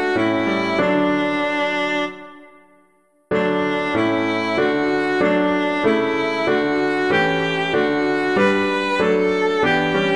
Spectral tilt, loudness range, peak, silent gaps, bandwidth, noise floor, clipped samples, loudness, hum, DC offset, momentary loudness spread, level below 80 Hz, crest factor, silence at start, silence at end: -6 dB/octave; 4 LU; -4 dBFS; none; 11 kHz; -59 dBFS; under 0.1%; -19 LUFS; none; 0.3%; 3 LU; -56 dBFS; 14 dB; 0 s; 0 s